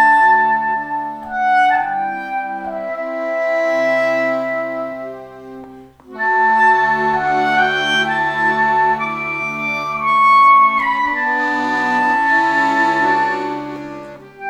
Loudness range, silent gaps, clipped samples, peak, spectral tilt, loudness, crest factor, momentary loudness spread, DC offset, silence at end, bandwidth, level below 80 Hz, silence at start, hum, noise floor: 6 LU; none; under 0.1%; -2 dBFS; -4 dB/octave; -15 LUFS; 14 dB; 14 LU; under 0.1%; 0 s; 10.5 kHz; -56 dBFS; 0 s; none; -38 dBFS